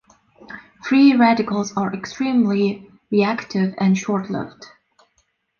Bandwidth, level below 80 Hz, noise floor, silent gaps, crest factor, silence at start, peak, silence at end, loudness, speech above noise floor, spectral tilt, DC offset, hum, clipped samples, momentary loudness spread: 7 kHz; -62 dBFS; -67 dBFS; none; 16 dB; 0.5 s; -4 dBFS; 0.95 s; -19 LUFS; 49 dB; -6.5 dB/octave; under 0.1%; none; under 0.1%; 20 LU